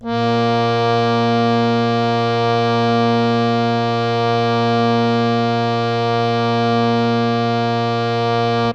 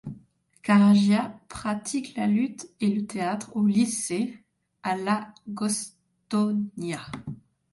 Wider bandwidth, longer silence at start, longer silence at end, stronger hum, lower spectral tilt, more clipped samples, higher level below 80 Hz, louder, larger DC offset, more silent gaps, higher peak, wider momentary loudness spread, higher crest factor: second, 8.2 kHz vs 11.5 kHz; about the same, 0 s vs 0.05 s; second, 0 s vs 0.35 s; neither; first, -7 dB/octave vs -5.5 dB/octave; neither; first, -50 dBFS vs -62 dBFS; first, -17 LUFS vs -26 LUFS; neither; neither; first, -4 dBFS vs -10 dBFS; second, 2 LU vs 16 LU; about the same, 14 dB vs 16 dB